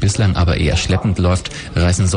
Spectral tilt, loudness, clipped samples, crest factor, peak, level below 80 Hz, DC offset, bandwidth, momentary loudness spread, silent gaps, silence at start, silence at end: -5.5 dB/octave; -16 LUFS; under 0.1%; 10 dB; -4 dBFS; -26 dBFS; under 0.1%; 10 kHz; 4 LU; none; 0 s; 0 s